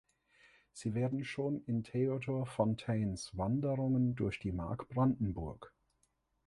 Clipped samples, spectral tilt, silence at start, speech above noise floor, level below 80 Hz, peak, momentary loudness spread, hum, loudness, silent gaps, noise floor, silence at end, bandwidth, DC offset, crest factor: under 0.1%; -7.5 dB/octave; 0.75 s; 43 dB; -56 dBFS; -18 dBFS; 8 LU; none; -36 LUFS; none; -78 dBFS; 0.8 s; 11.5 kHz; under 0.1%; 18 dB